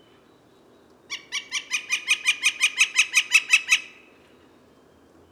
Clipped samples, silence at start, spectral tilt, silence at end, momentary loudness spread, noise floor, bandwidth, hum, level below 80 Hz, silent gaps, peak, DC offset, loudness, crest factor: under 0.1%; 1.1 s; 3.5 dB/octave; 1.4 s; 13 LU; -56 dBFS; 17.5 kHz; none; -76 dBFS; none; -6 dBFS; under 0.1%; -20 LUFS; 20 dB